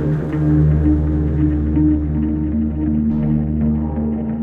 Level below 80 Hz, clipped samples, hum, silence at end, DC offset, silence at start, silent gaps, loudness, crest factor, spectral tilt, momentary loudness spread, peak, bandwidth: -24 dBFS; under 0.1%; none; 0 s; under 0.1%; 0 s; none; -18 LUFS; 12 dB; -12 dB/octave; 5 LU; -4 dBFS; 3.2 kHz